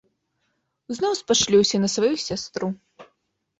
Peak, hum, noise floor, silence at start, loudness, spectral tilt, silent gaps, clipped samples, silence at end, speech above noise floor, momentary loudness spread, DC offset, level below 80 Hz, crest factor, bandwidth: -6 dBFS; none; -74 dBFS; 0.9 s; -22 LUFS; -3.5 dB/octave; none; under 0.1%; 0.55 s; 52 dB; 13 LU; under 0.1%; -60 dBFS; 18 dB; 8.2 kHz